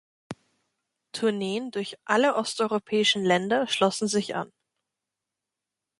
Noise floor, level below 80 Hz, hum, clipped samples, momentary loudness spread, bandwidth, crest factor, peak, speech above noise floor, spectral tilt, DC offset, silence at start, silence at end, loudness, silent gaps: -87 dBFS; -72 dBFS; none; under 0.1%; 19 LU; 11.5 kHz; 20 dB; -6 dBFS; 62 dB; -3.5 dB/octave; under 0.1%; 0.3 s; 1.55 s; -25 LUFS; none